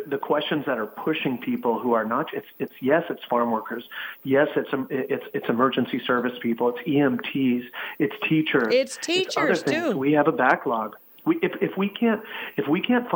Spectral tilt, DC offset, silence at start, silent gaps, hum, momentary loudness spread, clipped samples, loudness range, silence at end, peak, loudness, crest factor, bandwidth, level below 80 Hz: -5.5 dB/octave; under 0.1%; 0 s; none; none; 8 LU; under 0.1%; 3 LU; 0 s; -6 dBFS; -24 LUFS; 18 dB; 18 kHz; -72 dBFS